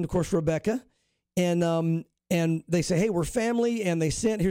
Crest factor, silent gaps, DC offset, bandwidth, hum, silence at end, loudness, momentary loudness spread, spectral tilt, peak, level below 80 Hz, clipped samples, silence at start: 12 dB; none; under 0.1%; 16.5 kHz; none; 0 s; -27 LUFS; 5 LU; -6 dB/octave; -14 dBFS; -48 dBFS; under 0.1%; 0 s